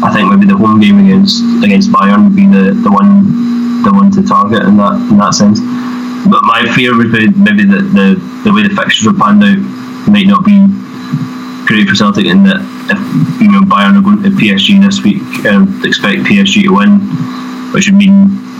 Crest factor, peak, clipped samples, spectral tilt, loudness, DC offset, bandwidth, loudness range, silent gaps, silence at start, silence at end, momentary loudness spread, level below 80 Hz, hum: 6 dB; 0 dBFS; 5%; -5.5 dB/octave; -7 LUFS; under 0.1%; 7.8 kHz; 2 LU; none; 0 s; 0 s; 9 LU; -46 dBFS; none